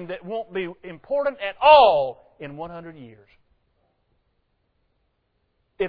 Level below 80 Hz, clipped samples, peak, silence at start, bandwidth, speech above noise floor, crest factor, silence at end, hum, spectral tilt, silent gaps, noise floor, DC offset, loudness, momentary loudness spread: -58 dBFS; under 0.1%; 0 dBFS; 0 s; 5.2 kHz; 50 dB; 22 dB; 0 s; none; -7 dB/octave; none; -71 dBFS; under 0.1%; -19 LUFS; 26 LU